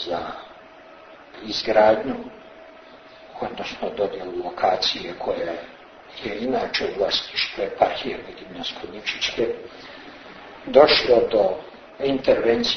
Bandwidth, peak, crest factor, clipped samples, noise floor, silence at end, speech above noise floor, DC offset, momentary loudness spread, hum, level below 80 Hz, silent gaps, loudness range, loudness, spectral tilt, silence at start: 6.6 kHz; 0 dBFS; 24 dB; under 0.1%; -45 dBFS; 0 s; 23 dB; under 0.1%; 23 LU; none; -54 dBFS; none; 6 LU; -22 LUFS; -4 dB/octave; 0 s